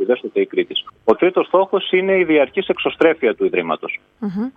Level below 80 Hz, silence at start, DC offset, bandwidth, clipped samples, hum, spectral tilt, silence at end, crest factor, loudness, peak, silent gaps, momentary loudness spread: -60 dBFS; 0 s; under 0.1%; 4.8 kHz; under 0.1%; none; -7.5 dB/octave; 0.05 s; 16 dB; -18 LUFS; 0 dBFS; none; 9 LU